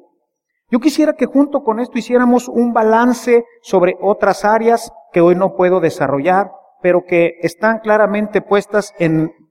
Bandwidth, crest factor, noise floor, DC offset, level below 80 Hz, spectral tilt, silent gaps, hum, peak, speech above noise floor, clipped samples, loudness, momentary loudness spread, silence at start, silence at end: 16 kHz; 14 dB; -71 dBFS; under 0.1%; -54 dBFS; -6.5 dB/octave; none; none; 0 dBFS; 58 dB; under 0.1%; -14 LUFS; 6 LU; 0.7 s; 0.2 s